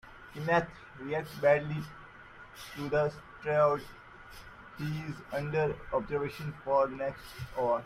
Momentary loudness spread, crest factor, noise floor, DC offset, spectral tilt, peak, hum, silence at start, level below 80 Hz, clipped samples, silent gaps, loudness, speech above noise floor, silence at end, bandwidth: 22 LU; 20 dB; -52 dBFS; under 0.1%; -6.5 dB/octave; -14 dBFS; none; 0.05 s; -58 dBFS; under 0.1%; none; -32 LUFS; 20 dB; 0 s; 15.5 kHz